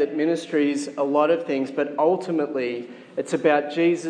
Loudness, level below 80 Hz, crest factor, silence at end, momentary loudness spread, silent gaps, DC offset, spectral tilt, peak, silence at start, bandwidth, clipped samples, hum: -23 LUFS; -84 dBFS; 16 dB; 0 s; 8 LU; none; under 0.1%; -5.5 dB/octave; -6 dBFS; 0 s; 10 kHz; under 0.1%; none